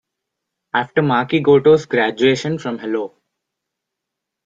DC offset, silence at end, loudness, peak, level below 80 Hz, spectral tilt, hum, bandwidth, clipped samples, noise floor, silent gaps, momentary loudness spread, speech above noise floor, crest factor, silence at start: under 0.1%; 1.4 s; -17 LUFS; -2 dBFS; -60 dBFS; -6 dB/octave; none; 7.6 kHz; under 0.1%; -81 dBFS; none; 11 LU; 65 dB; 16 dB; 0.75 s